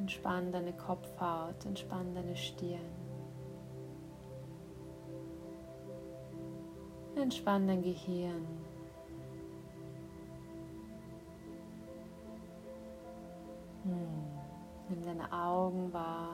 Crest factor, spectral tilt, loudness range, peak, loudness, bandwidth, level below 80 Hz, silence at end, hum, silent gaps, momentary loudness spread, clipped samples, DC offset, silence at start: 20 dB; -6.5 dB/octave; 12 LU; -22 dBFS; -42 LUFS; 16 kHz; -64 dBFS; 0 s; none; none; 15 LU; under 0.1%; under 0.1%; 0 s